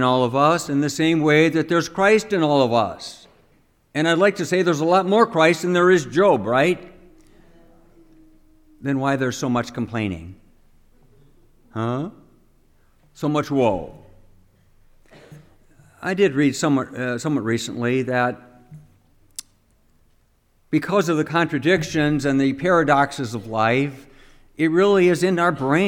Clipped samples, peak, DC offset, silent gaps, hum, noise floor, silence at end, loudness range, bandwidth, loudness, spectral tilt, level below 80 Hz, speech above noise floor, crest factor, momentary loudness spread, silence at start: under 0.1%; -2 dBFS; under 0.1%; none; none; -60 dBFS; 0 s; 9 LU; 16.5 kHz; -20 LUFS; -5.5 dB/octave; -54 dBFS; 41 dB; 18 dB; 12 LU; 0 s